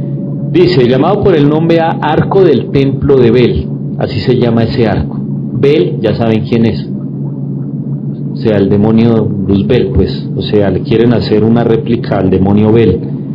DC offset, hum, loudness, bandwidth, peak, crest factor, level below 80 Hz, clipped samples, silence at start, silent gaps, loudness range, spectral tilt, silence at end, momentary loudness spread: under 0.1%; none; -10 LUFS; 6 kHz; 0 dBFS; 10 dB; -34 dBFS; 2%; 0 s; none; 4 LU; -10 dB/octave; 0 s; 10 LU